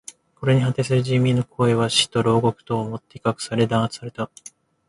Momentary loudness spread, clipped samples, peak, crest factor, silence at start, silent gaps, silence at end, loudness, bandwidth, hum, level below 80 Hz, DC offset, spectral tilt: 13 LU; under 0.1%; -4 dBFS; 16 dB; 0.4 s; none; 0.65 s; -21 LUFS; 11.5 kHz; none; -54 dBFS; under 0.1%; -5.5 dB/octave